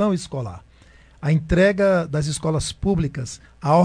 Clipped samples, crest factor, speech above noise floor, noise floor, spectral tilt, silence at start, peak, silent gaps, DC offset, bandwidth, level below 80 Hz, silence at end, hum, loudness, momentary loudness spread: under 0.1%; 16 dB; 30 dB; -50 dBFS; -6 dB/octave; 0 s; -4 dBFS; none; under 0.1%; 10.5 kHz; -38 dBFS; 0 s; none; -21 LUFS; 14 LU